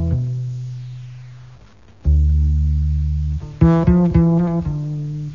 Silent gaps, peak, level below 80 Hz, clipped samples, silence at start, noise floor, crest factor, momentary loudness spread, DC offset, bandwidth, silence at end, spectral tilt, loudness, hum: none; -2 dBFS; -22 dBFS; under 0.1%; 0 s; -46 dBFS; 16 dB; 17 LU; 0.4%; 5 kHz; 0 s; -10.5 dB/octave; -18 LUFS; none